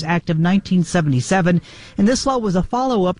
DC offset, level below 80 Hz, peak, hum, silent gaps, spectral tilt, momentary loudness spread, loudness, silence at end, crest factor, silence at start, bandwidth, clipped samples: 0.5%; -40 dBFS; -4 dBFS; none; none; -6 dB/octave; 3 LU; -18 LUFS; 0.05 s; 12 dB; 0 s; 10.5 kHz; under 0.1%